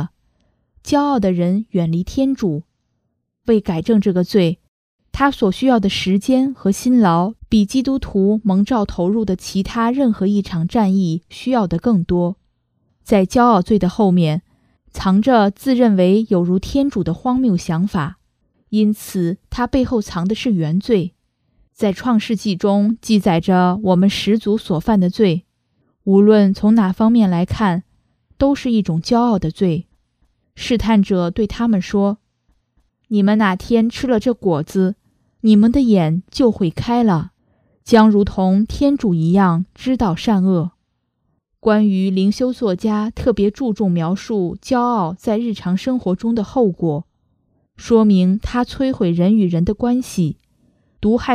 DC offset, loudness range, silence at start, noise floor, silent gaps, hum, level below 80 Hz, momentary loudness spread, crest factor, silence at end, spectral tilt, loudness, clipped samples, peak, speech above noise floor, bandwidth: under 0.1%; 4 LU; 0 s; -71 dBFS; 4.68-4.99 s; none; -40 dBFS; 8 LU; 16 dB; 0 s; -7 dB/octave; -17 LUFS; under 0.1%; 0 dBFS; 55 dB; 14 kHz